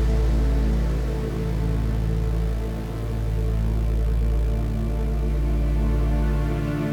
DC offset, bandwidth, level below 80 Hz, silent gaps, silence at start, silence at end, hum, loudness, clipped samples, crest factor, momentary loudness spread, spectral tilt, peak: under 0.1%; 7.8 kHz; -24 dBFS; none; 0 s; 0 s; none; -25 LUFS; under 0.1%; 10 dB; 4 LU; -8 dB/octave; -12 dBFS